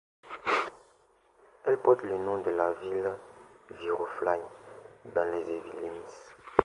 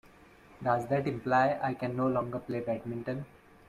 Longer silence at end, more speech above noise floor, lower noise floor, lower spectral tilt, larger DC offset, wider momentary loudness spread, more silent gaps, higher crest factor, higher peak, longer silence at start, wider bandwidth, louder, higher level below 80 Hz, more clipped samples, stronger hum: second, 0 s vs 0.4 s; first, 34 dB vs 26 dB; first, -65 dBFS vs -57 dBFS; second, -5.5 dB/octave vs -8 dB/octave; neither; first, 20 LU vs 10 LU; neither; first, 30 dB vs 18 dB; first, -2 dBFS vs -14 dBFS; second, 0.25 s vs 0.5 s; second, 11 kHz vs 14 kHz; about the same, -31 LUFS vs -32 LUFS; about the same, -64 dBFS vs -64 dBFS; neither; neither